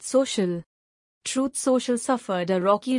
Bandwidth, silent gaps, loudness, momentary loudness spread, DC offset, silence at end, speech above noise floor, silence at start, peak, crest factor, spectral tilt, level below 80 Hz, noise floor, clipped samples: 11.5 kHz; 0.66-1.21 s; -25 LUFS; 7 LU; under 0.1%; 0 s; over 66 dB; 0 s; -6 dBFS; 18 dB; -4.5 dB/octave; -68 dBFS; under -90 dBFS; under 0.1%